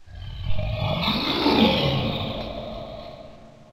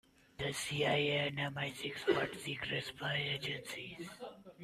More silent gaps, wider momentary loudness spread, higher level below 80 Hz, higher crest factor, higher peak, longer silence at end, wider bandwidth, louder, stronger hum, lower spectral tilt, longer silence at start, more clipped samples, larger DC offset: neither; first, 20 LU vs 14 LU; first, -38 dBFS vs -68 dBFS; about the same, 20 dB vs 20 dB; first, -4 dBFS vs -18 dBFS; about the same, 0 s vs 0 s; first, 16 kHz vs 14.5 kHz; first, -23 LUFS vs -37 LUFS; neither; first, -6.5 dB/octave vs -4 dB/octave; second, 0.05 s vs 0.4 s; neither; neither